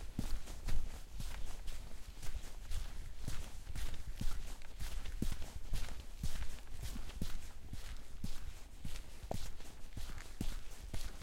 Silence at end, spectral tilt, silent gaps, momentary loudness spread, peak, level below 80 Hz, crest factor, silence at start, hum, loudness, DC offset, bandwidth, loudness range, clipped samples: 0 s; -4.5 dB/octave; none; 7 LU; -20 dBFS; -42 dBFS; 16 dB; 0 s; none; -49 LUFS; under 0.1%; 15 kHz; 3 LU; under 0.1%